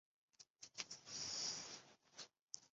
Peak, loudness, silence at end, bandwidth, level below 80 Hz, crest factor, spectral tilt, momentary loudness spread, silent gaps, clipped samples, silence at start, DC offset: -28 dBFS; -49 LUFS; 0.05 s; 8 kHz; -86 dBFS; 26 dB; 0 dB/octave; 18 LU; 0.50-0.54 s, 2.41-2.48 s; under 0.1%; 0.4 s; under 0.1%